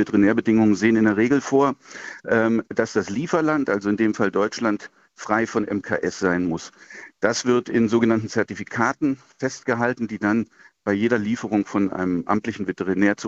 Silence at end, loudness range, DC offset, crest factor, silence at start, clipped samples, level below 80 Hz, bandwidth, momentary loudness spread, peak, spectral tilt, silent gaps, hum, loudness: 0 s; 3 LU; under 0.1%; 18 dB; 0 s; under 0.1%; -60 dBFS; 8 kHz; 10 LU; -4 dBFS; -6 dB/octave; none; none; -22 LUFS